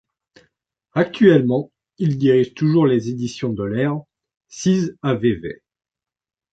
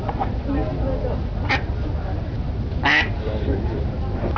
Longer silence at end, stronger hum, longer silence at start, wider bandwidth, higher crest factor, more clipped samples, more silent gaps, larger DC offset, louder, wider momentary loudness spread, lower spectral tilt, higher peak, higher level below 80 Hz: first, 1 s vs 0 s; neither; first, 0.95 s vs 0 s; first, 8 kHz vs 5.4 kHz; about the same, 18 dB vs 16 dB; neither; neither; second, under 0.1% vs 0.2%; first, -19 LUFS vs -23 LUFS; first, 14 LU vs 9 LU; about the same, -7 dB/octave vs -7 dB/octave; first, -2 dBFS vs -6 dBFS; second, -54 dBFS vs -26 dBFS